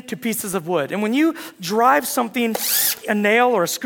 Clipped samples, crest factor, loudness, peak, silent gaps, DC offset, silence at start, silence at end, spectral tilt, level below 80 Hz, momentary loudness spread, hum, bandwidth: under 0.1%; 18 dB; -19 LUFS; -2 dBFS; none; under 0.1%; 0.05 s; 0 s; -3 dB/octave; -68 dBFS; 8 LU; none; 18 kHz